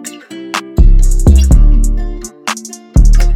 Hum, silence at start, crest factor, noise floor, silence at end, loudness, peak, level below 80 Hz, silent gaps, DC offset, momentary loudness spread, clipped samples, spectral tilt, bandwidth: none; 0 s; 8 dB; -27 dBFS; 0 s; -12 LUFS; 0 dBFS; -8 dBFS; none; under 0.1%; 14 LU; 0.1%; -5.5 dB/octave; 12 kHz